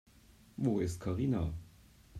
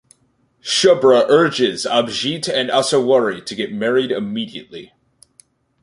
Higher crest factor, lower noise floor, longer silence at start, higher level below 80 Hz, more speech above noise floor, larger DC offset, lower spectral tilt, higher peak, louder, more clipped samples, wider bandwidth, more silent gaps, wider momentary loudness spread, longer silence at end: about the same, 16 dB vs 16 dB; about the same, -61 dBFS vs -61 dBFS; about the same, 0.6 s vs 0.65 s; first, -54 dBFS vs -62 dBFS; second, 28 dB vs 45 dB; neither; first, -8 dB/octave vs -3.5 dB/octave; second, -20 dBFS vs -2 dBFS; second, -35 LUFS vs -16 LUFS; neither; first, 14.5 kHz vs 11.5 kHz; neither; second, 12 LU vs 15 LU; second, 0 s vs 1 s